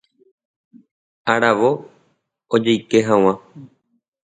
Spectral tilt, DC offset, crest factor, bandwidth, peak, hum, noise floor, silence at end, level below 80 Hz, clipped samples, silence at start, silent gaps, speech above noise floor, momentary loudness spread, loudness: -5.5 dB/octave; under 0.1%; 20 dB; 9.4 kHz; 0 dBFS; none; -67 dBFS; 0.55 s; -62 dBFS; under 0.1%; 1.25 s; none; 51 dB; 12 LU; -18 LUFS